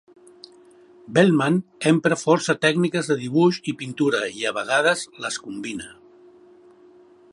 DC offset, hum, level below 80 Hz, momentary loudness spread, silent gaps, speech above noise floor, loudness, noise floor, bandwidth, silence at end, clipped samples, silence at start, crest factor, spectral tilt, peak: under 0.1%; none; -66 dBFS; 12 LU; none; 30 dB; -21 LUFS; -51 dBFS; 11.5 kHz; 1.4 s; under 0.1%; 1.1 s; 20 dB; -5 dB/octave; -2 dBFS